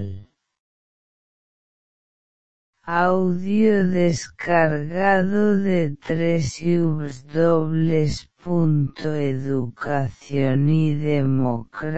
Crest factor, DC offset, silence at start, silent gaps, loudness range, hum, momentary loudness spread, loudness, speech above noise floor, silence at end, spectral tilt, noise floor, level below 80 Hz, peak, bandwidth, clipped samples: 18 dB; 2%; 0 s; 0.60-2.73 s; 4 LU; none; 7 LU; -21 LUFS; over 70 dB; 0 s; -7.5 dB/octave; under -90 dBFS; -50 dBFS; -2 dBFS; 8.2 kHz; under 0.1%